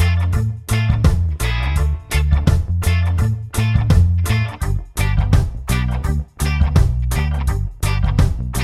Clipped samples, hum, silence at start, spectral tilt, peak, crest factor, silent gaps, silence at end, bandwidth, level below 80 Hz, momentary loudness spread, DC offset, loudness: under 0.1%; none; 0 s; -6 dB/octave; 0 dBFS; 16 dB; none; 0 s; 14.5 kHz; -22 dBFS; 6 LU; 0.3%; -18 LUFS